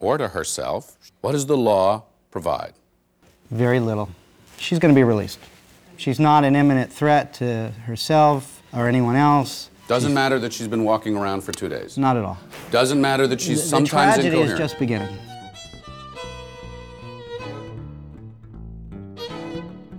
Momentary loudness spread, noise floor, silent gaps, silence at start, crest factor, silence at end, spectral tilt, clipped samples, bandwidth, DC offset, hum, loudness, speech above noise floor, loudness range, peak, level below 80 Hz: 22 LU; -59 dBFS; none; 0 s; 18 dB; 0 s; -5.5 dB/octave; under 0.1%; 18 kHz; under 0.1%; none; -20 LUFS; 39 dB; 17 LU; -4 dBFS; -50 dBFS